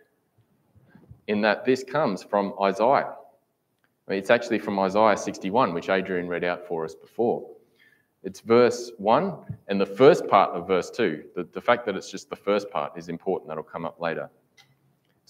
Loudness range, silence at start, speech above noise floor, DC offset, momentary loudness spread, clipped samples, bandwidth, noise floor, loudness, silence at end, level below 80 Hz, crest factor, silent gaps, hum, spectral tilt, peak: 6 LU; 1.3 s; 47 dB; under 0.1%; 15 LU; under 0.1%; 14 kHz; -71 dBFS; -24 LUFS; 1 s; -70 dBFS; 22 dB; none; none; -5.5 dB/octave; -2 dBFS